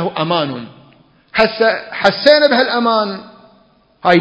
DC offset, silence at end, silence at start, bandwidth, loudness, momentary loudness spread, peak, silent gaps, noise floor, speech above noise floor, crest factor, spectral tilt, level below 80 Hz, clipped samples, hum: under 0.1%; 0 s; 0 s; 8 kHz; -14 LUFS; 13 LU; 0 dBFS; none; -52 dBFS; 38 dB; 16 dB; -6 dB/octave; -54 dBFS; 0.1%; none